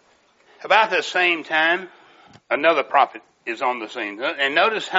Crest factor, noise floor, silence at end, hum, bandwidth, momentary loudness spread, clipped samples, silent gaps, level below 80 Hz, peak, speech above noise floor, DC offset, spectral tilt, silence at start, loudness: 20 dB; -58 dBFS; 0 s; none; 8 kHz; 10 LU; under 0.1%; none; -80 dBFS; 0 dBFS; 37 dB; under 0.1%; 1 dB/octave; 0.6 s; -20 LUFS